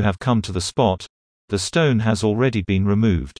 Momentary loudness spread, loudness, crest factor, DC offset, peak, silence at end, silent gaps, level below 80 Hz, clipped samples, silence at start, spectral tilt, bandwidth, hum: 7 LU; -20 LUFS; 16 dB; under 0.1%; -4 dBFS; 0.1 s; 1.09-1.48 s; -40 dBFS; under 0.1%; 0 s; -6 dB/octave; 10.5 kHz; none